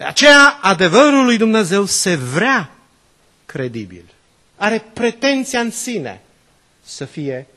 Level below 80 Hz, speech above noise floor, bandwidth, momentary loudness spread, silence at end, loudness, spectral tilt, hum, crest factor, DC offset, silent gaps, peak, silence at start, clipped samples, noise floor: -56 dBFS; 41 dB; 13 kHz; 23 LU; 0.15 s; -13 LUFS; -3.5 dB/octave; none; 16 dB; under 0.1%; none; 0 dBFS; 0 s; under 0.1%; -55 dBFS